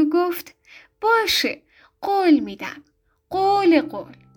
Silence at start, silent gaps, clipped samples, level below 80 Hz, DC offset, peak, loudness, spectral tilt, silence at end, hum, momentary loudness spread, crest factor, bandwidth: 0 s; none; under 0.1%; -60 dBFS; under 0.1%; -6 dBFS; -20 LUFS; -3.5 dB/octave; 0.25 s; none; 16 LU; 16 dB; over 20 kHz